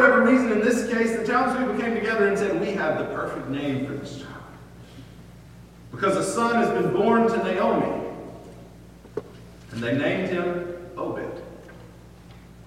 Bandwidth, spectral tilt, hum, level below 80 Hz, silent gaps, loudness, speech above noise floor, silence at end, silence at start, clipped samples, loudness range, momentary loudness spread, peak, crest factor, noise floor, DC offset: 15 kHz; -5.5 dB/octave; none; -52 dBFS; none; -23 LUFS; 23 dB; 0.05 s; 0 s; under 0.1%; 6 LU; 23 LU; -4 dBFS; 20 dB; -46 dBFS; under 0.1%